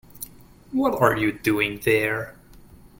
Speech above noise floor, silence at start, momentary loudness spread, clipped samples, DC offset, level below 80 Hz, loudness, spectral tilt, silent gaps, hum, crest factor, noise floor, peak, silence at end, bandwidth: 26 dB; 0.15 s; 19 LU; under 0.1%; under 0.1%; -50 dBFS; -22 LUFS; -5.5 dB/octave; none; none; 22 dB; -48 dBFS; -4 dBFS; 0.7 s; 17 kHz